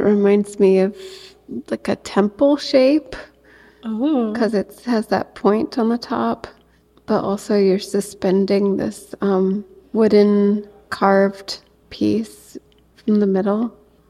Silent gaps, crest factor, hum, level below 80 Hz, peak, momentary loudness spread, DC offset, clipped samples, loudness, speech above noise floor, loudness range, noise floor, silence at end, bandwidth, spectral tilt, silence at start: none; 16 dB; none; -54 dBFS; -2 dBFS; 16 LU; under 0.1%; under 0.1%; -19 LUFS; 36 dB; 3 LU; -54 dBFS; 0.4 s; 13.5 kHz; -6.5 dB/octave; 0 s